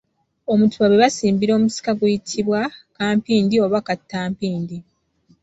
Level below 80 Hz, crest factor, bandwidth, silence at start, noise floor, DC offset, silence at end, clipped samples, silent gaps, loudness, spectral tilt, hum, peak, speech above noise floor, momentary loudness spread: -56 dBFS; 16 dB; 8 kHz; 0.5 s; -59 dBFS; under 0.1%; 0.6 s; under 0.1%; none; -19 LUFS; -5.5 dB/octave; none; -4 dBFS; 41 dB; 12 LU